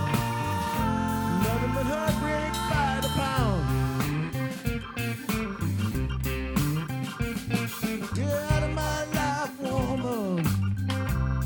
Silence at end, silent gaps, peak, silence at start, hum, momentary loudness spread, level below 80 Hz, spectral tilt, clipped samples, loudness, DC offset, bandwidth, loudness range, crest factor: 0 s; none; -10 dBFS; 0 s; none; 5 LU; -38 dBFS; -6 dB/octave; under 0.1%; -28 LUFS; under 0.1%; 19.5 kHz; 3 LU; 16 dB